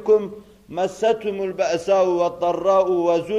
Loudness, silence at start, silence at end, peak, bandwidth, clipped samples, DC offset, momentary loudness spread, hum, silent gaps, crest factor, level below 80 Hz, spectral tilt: -20 LUFS; 0 s; 0 s; -6 dBFS; 11 kHz; under 0.1%; under 0.1%; 8 LU; none; none; 14 dB; -58 dBFS; -5.5 dB/octave